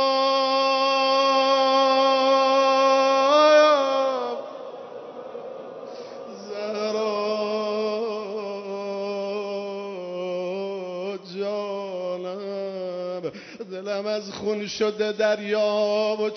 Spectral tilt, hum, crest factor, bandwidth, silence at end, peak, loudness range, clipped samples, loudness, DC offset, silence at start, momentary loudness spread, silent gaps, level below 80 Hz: -3.5 dB/octave; none; 16 dB; 6.4 kHz; 0 s; -8 dBFS; 12 LU; under 0.1%; -23 LUFS; under 0.1%; 0 s; 18 LU; none; -76 dBFS